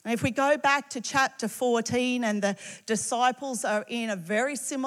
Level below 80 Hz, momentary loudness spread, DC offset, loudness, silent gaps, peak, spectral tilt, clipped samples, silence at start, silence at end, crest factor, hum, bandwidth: -74 dBFS; 7 LU; under 0.1%; -27 LUFS; none; -10 dBFS; -3.5 dB/octave; under 0.1%; 0.05 s; 0 s; 16 dB; none; 16 kHz